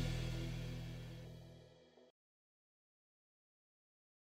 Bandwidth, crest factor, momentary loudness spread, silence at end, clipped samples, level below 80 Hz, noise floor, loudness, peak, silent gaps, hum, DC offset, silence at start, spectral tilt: 16 kHz; 20 dB; 22 LU; 2.1 s; under 0.1%; -56 dBFS; -65 dBFS; -47 LUFS; -28 dBFS; none; none; under 0.1%; 0 s; -6 dB/octave